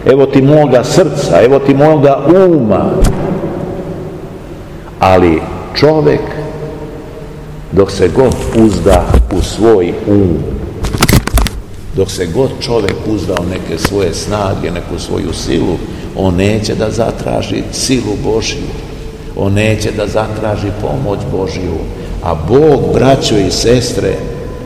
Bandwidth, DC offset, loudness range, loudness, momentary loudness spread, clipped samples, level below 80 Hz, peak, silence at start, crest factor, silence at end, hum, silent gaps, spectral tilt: over 20 kHz; 0.4%; 5 LU; -11 LUFS; 15 LU; 2%; -22 dBFS; 0 dBFS; 0 s; 12 dB; 0 s; none; none; -6 dB/octave